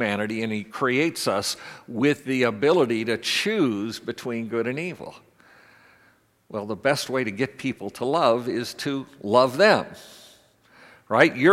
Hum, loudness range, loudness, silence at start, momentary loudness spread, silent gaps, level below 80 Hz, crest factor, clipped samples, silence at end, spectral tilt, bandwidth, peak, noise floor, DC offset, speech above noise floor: none; 7 LU; -24 LUFS; 0 s; 13 LU; none; -70 dBFS; 24 dB; under 0.1%; 0 s; -4.5 dB/octave; 16 kHz; 0 dBFS; -61 dBFS; under 0.1%; 37 dB